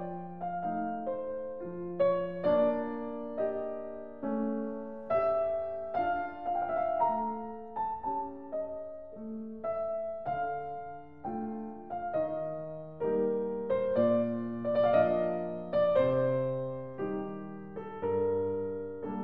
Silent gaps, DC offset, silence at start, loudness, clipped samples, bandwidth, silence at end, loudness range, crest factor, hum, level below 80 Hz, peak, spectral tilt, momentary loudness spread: none; 0.2%; 0 s; -33 LUFS; under 0.1%; 5.2 kHz; 0 s; 8 LU; 18 dB; none; -64 dBFS; -14 dBFS; -10 dB/octave; 13 LU